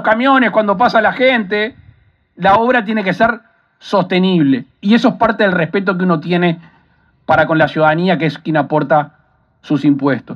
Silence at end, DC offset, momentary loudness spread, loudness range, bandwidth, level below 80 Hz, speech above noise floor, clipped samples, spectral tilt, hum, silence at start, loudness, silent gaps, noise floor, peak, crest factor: 0 s; under 0.1%; 6 LU; 1 LU; 7 kHz; -52 dBFS; 41 dB; under 0.1%; -7.5 dB/octave; none; 0 s; -14 LUFS; none; -54 dBFS; 0 dBFS; 14 dB